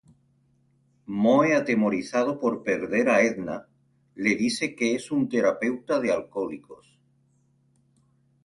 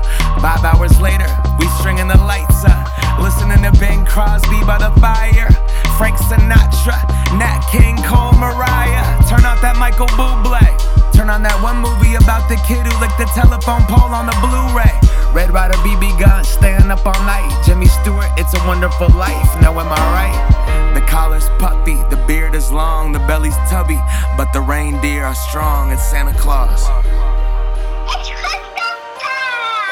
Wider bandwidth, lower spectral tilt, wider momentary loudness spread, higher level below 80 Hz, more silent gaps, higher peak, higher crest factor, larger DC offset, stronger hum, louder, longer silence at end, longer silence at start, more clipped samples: second, 11.5 kHz vs 17 kHz; about the same, -5 dB/octave vs -5.5 dB/octave; first, 12 LU vs 6 LU; second, -66 dBFS vs -12 dBFS; neither; second, -8 dBFS vs 0 dBFS; first, 18 dB vs 10 dB; neither; neither; second, -25 LUFS vs -14 LUFS; first, 1.7 s vs 0 s; first, 1.1 s vs 0 s; neither